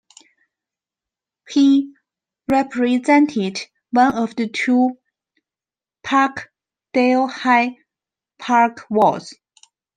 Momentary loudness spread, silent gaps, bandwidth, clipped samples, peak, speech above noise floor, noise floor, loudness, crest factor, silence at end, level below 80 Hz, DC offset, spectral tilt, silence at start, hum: 15 LU; none; 9.2 kHz; under 0.1%; -2 dBFS; over 73 dB; under -90 dBFS; -18 LUFS; 18 dB; 0.65 s; -62 dBFS; under 0.1%; -5 dB/octave; 1.5 s; none